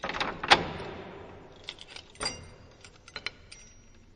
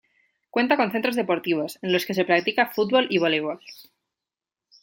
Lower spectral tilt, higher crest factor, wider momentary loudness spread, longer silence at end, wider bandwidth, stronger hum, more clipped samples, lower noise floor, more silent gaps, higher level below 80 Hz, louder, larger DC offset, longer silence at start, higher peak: second, -2.5 dB/octave vs -5 dB/octave; first, 32 dB vs 20 dB; first, 27 LU vs 6 LU; second, 0.25 s vs 1 s; second, 9.8 kHz vs 17 kHz; neither; neither; second, -54 dBFS vs -89 dBFS; neither; first, -54 dBFS vs -74 dBFS; second, -29 LUFS vs -23 LUFS; neither; second, 0.05 s vs 0.55 s; about the same, -2 dBFS vs -4 dBFS